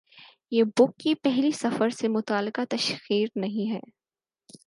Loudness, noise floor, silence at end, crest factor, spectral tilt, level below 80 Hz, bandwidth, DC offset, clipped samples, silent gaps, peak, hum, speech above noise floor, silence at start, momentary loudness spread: -26 LUFS; under -90 dBFS; 0.1 s; 18 dB; -5 dB/octave; -78 dBFS; 11.5 kHz; under 0.1%; under 0.1%; none; -8 dBFS; none; over 65 dB; 0.15 s; 7 LU